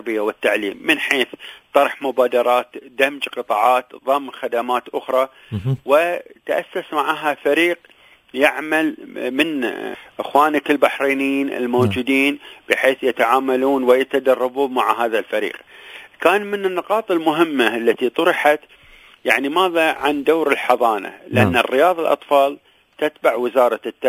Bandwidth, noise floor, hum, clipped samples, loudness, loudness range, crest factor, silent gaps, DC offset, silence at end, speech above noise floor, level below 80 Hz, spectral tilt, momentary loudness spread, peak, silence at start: 16 kHz; -40 dBFS; none; under 0.1%; -18 LUFS; 3 LU; 18 dB; none; under 0.1%; 0 s; 21 dB; -54 dBFS; -5 dB/octave; 8 LU; 0 dBFS; 0.05 s